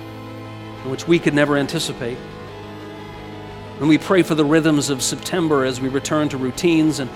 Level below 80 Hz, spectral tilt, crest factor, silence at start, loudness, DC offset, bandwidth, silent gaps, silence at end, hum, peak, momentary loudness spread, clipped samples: -48 dBFS; -5 dB/octave; 18 dB; 0 s; -19 LUFS; under 0.1%; 15.5 kHz; none; 0 s; none; 0 dBFS; 18 LU; under 0.1%